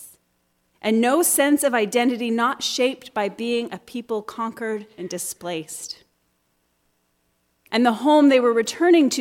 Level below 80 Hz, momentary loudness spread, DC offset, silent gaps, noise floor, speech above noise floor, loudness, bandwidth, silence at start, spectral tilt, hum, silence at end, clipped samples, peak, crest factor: -72 dBFS; 15 LU; under 0.1%; none; -69 dBFS; 48 dB; -21 LUFS; 18 kHz; 0 s; -3 dB/octave; none; 0 s; under 0.1%; -6 dBFS; 16 dB